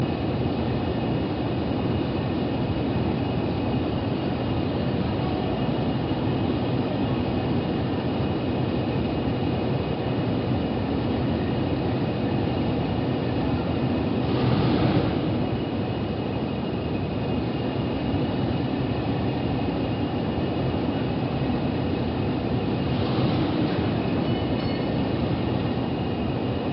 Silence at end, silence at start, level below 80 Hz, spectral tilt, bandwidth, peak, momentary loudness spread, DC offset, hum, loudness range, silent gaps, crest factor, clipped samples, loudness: 0 s; 0 s; -40 dBFS; -6.5 dB/octave; 5.8 kHz; -8 dBFS; 3 LU; under 0.1%; none; 2 LU; none; 16 dB; under 0.1%; -26 LUFS